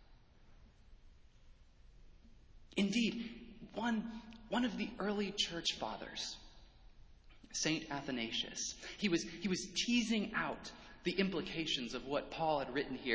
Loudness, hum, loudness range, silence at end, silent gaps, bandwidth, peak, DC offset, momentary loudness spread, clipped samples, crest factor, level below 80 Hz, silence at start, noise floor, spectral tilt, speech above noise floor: -38 LUFS; none; 4 LU; 0 s; none; 8 kHz; -20 dBFS; under 0.1%; 10 LU; under 0.1%; 20 dB; -62 dBFS; 0 s; -62 dBFS; -3.5 dB/octave; 24 dB